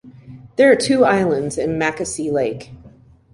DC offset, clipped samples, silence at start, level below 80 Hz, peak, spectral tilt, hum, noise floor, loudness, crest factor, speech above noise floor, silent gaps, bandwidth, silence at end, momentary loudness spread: under 0.1%; under 0.1%; 0.05 s; -50 dBFS; -2 dBFS; -5 dB/octave; none; -46 dBFS; -17 LUFS; 16 dB; 29 dB; none; 11.5 kHz; 0.45 s; 11 LU